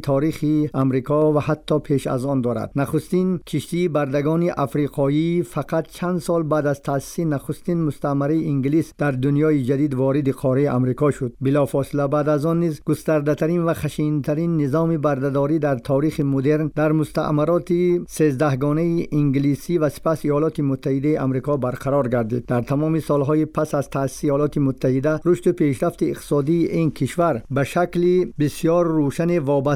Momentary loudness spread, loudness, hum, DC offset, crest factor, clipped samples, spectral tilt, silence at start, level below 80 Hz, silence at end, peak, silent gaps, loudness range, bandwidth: 4 LU; -21 LUFS; none; under 0.1%; 12 dB; under 0.1%; -8 dB/octave; 0 s; -48 dBFS; 0 s; -8 dBFS; none; 2 LU; 15.5 kHz